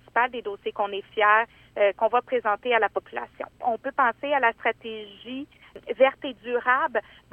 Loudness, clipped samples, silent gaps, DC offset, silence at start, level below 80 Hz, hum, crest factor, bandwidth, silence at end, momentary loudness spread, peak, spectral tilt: -24 LUFS; under 0.1%; none; under 0.1%; 0.15 s; -64 dBFS; none; 20 dB; 4.4 kHz; 0.35 s; 15 LU; -6 dBFS; -5.5 dB/octave